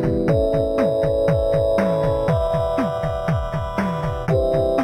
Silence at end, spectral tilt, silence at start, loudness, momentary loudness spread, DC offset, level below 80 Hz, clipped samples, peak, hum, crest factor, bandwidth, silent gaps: 0 s; -8 dB/octave; 0 s; -20 LUFS; 5 LU; under 0.1%; -32 dBFS; under 0.1%; -6 dBFS; none; 12 dB; 14.5 kHz; none